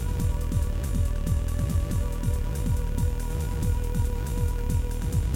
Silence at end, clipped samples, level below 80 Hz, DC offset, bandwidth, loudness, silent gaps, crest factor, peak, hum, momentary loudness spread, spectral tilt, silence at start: 0 s; under 0.1%; -28 dBFS; under 0.1%; 16.5 kHz; -28 LUFS; none; 12 dB; -14 dBFS; none; 2 LU; -6.5 dB/octave; 0 s